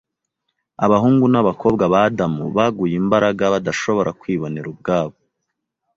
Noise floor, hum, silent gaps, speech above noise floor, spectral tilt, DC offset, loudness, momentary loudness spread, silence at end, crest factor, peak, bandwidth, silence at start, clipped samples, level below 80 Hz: -77 dBFS; none; none; 60 dB; -7 dB/octave; under 0.1%; -18 LUFS; 9 LU; 0.85 s; 16 dB; -2 dBFS; 7.8 kHz; 0.8 s; under 0.1%; -52 dBFS